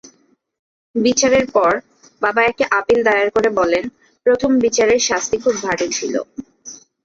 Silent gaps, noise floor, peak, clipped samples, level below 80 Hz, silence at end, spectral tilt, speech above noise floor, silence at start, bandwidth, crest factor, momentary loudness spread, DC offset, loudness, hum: none; -57 dBFS; -2 dBFS; under 0.1%; -50 dBFS; 0.3 s; -2.5 dB/octave; 42 dB; 0.95 s; 7.8 kHz; 14 dB; 13 LU; under 0.1%; -16 LUFS; none